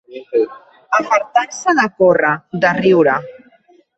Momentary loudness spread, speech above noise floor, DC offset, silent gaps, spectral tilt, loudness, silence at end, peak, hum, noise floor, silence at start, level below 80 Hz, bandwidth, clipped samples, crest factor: 7 LU; 37 dB; under 0.1%; none; -5 dB/octave; -15 LUFS; 0.65 s; -2 dBFS; none; -51 dBFS; 0.1 s; -60 dBFS; 8.4 kHz; under 0.1%; 14 dB